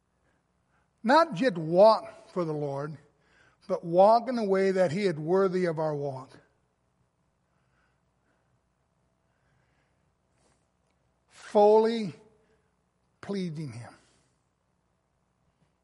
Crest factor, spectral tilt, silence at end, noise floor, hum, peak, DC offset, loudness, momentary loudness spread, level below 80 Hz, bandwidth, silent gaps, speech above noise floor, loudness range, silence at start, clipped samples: 20 dB; -7 dB/octave; 1.95 s; -74 dBFS; none; -10 dBFS; under 0.1%; -26 LUFS; 17 LU; -76 dBFS; 11.5 kHz; none; 49 dB; 15 LU; 1.05 s; under 0.1%